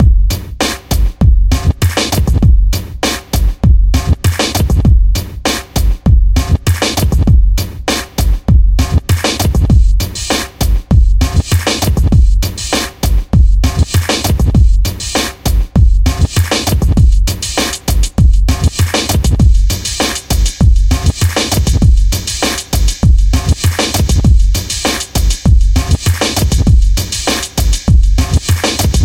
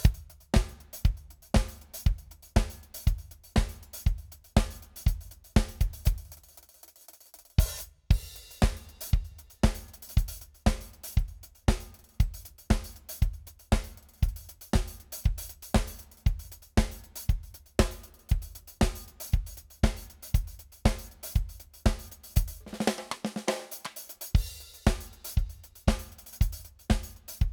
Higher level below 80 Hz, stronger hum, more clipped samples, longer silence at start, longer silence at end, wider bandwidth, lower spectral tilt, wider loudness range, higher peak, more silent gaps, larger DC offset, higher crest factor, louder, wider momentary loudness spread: first, -12 dBFS vs -32 dBFS; neither; neither; about the same, 0 s vs 0 s; about the same, 0 s vs 0 s; second, 17 kHz vs over 20 kHz; about the same, -4.5 dB/octave vs -5.5 dB/octave; about the same, 1 LU vs 1 LU; first, 0 dBFS vs -6 dBFS; neither; neither; second, 10 dB vs 24 dB; first, -12 LUFS vs -32 LUFS; second, 5 LU vs 13 LU